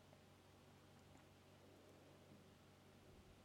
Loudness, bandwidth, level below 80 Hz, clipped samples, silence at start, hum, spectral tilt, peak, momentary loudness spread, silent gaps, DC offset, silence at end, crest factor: -67 LUFS; 16.5 kHz; -80 dBFS; under 0.1%; 0 s; none; -5 dB/octave; -50 dBFS; 1 LU; none; under 0.1%; 0 s; 16 dB